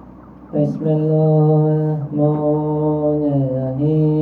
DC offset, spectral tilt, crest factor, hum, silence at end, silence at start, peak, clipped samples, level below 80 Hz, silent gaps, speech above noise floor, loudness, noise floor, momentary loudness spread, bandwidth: under 0.1%; -12.5 dB/octave; 12 dB; none; 0 s; 0.05 s; -4 dBFS; under 0.1%; -50 dBFS; none; 23 dB; -17 LUFS; -39 dBFS; 6 LU; 3.1 kHz